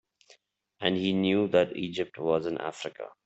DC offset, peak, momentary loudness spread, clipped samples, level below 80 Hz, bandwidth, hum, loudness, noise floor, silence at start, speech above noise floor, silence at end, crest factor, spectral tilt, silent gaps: under 0.1%; -10 dBFS; 11 LU; under 0.1%; -68 dBFS; 8.2 kHz; none; -29 LUFS; -64 dBFS; 0.8 s; 36 dB; 0.15 s; 20 dB; -6 dB/octave; none